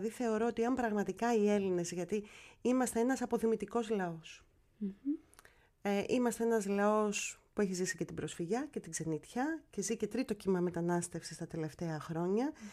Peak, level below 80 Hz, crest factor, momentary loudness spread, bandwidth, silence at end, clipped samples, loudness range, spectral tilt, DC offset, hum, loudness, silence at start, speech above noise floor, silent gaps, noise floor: -20 dBFS; -68 dBFS; 16 dB; 10 LU; 15.5 kHz; 0 s; under 0.1%; 3 LU; -5.5 dB/octave; under 0.1%; none; -36 LUFS; 0 s; 29 dB; none; -64 dBFS